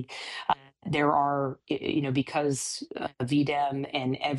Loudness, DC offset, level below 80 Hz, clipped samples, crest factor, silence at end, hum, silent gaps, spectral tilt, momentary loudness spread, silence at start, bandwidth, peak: -29 LUFS; under 0.1%; -64 dBFS; under 0.1%; 20 dB; 0 s; none; none; -5 dB/octave; 8 LU; 0 s; 12.5 kHz; -8 dBFS